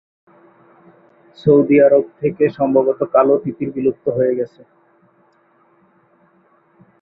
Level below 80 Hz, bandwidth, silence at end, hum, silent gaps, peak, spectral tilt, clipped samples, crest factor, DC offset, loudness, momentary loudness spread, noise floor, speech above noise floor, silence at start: -60 dBFS; 5 kHz; 2.55 s; none; none; -2 dBFS; -11 dB/octave; under 0.1%; 18 dB; under 0.1%; -16 LUFS; 11 LU; -56 dBFS; 41 dB; 1.45 s